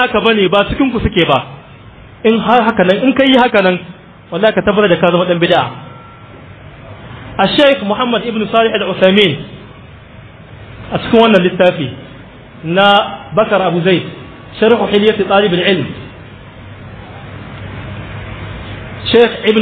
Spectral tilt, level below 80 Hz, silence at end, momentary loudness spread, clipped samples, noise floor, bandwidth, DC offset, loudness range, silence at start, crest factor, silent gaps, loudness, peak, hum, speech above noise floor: -7.5 dB/octave; -38 dBFS; 0 s; 22 LU; 0.1%; -36 dBFS; 9 kHz; under 0.1%; 5 LU; 0 s; 14 dB; none; -11 LUFS; 0 dBFS; none; 25 dB